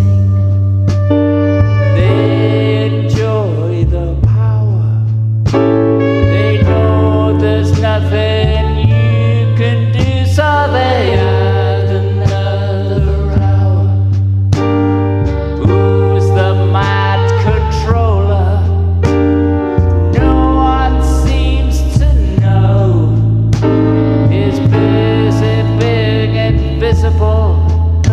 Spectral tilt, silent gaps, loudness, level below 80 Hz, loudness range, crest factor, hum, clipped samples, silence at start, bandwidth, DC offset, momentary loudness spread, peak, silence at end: -8 dB/octave; none; -12 LUFS; -20 dBFS; 1 LU; 10 dB; none; under 0.1%; 0 s; 8.2 kHz; under 0.1%; 3 LU; 0 dBFS; 0 s